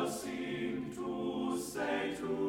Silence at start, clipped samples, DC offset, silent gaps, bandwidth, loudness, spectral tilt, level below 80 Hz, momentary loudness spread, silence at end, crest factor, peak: 0 s; under 0.1%; under 0.1%; none; 17.5 kHz; -37 LUFS; -4.5 dB/octave; -66 dBFS; 4 LU; 0 s; 14 dB; -22 dBFS